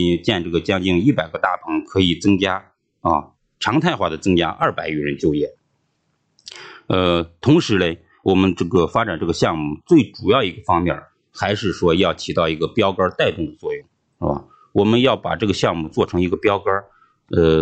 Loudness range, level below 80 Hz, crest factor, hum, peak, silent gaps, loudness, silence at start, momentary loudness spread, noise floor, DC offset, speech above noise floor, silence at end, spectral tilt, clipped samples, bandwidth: 3 LU; -44 dBFS; 16 dB; none; -2 dBFS; none; -19 LUFS; 0 s; 9 LU; -68 dBFS; under 0.1%; 50 dB; 0 s; -6 dB/octave; under 0.1%; 8.8 kHz